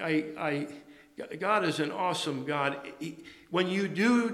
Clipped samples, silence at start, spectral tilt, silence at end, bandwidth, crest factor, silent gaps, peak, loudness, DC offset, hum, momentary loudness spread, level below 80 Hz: under 0.1%; 0 s; -5 dB/octave; 0 s; 13.5 kHz; 18 dB; none; -12 dBFS; -30 LUFS; under 0.1%; none; 15 LU; -76 dBFS